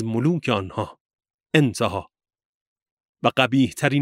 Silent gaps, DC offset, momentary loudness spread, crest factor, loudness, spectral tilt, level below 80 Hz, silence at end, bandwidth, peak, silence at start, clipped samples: 1.00-1.10 s, 1.34-1.39 s, 2.45-2.76 s, 2.82-2.97 s, 3.05-3.14 s; under 0.1%; 12 LU; 20 dB; -22 LUFS; -6 dB/octave; -60 dBFS; 0 s; 15.5 kHz; -2 dBFS; 0 s; under 0.1%